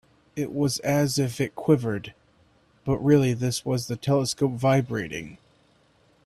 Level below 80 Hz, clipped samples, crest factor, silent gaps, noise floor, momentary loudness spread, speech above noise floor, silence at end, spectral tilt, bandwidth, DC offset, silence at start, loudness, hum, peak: -56 dBFS; under 0.1%; 18 dB; none; -62 dBFS; 14 LU; 38 dB; 0.9 s; -6 dB/octave; 14.5 kHz; under 0.1%; 0.35 s; -25 LUFS; none; -8 dBFS